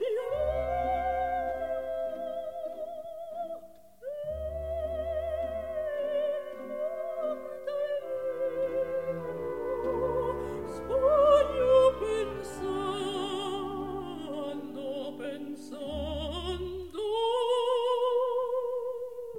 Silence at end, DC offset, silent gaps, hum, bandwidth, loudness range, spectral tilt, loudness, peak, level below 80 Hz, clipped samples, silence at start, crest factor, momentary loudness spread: 0 s; 0.2%; none; none; 16 kHz; 10 LU; -5.5 dB/octave; -31 LUFS; -12 dBFS; -50 dBFS; under 0.1%; 0 s; 18 dB; 12 LU